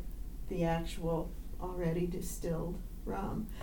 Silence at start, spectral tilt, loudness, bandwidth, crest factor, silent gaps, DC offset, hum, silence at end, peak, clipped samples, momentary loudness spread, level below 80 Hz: 0 s; -6.5 dB/octave; -38 LUFS; 19 kHz; 16 dB; none; under 0.1%; none; 0 s; -20 dBFS; under 0.1%; 10 LU; -42 dBFS